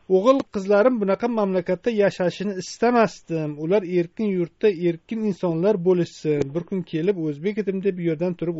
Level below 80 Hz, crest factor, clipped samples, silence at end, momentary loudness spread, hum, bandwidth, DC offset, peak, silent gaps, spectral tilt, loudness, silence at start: -60 dBFS; 18 dB; under 0.1%; 0 s; 8 LU; none; 8 kHz; under 0.1%; -4 dBFS; none; -6.5 dB/octave; -22 LUFS; 0.1 s